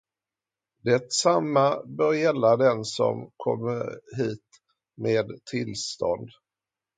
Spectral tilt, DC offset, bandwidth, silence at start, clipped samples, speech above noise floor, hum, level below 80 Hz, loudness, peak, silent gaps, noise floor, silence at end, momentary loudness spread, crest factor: -4.5 dB/octave; under 0.1%; 9.4 kHz; 0.85 s; under 0.1%; over 65 dB; none; -66 dBFS; -25 LUFS; -6 dBFS; none; under -90 dBFS; 0.7 s; 11 LU; 20 dB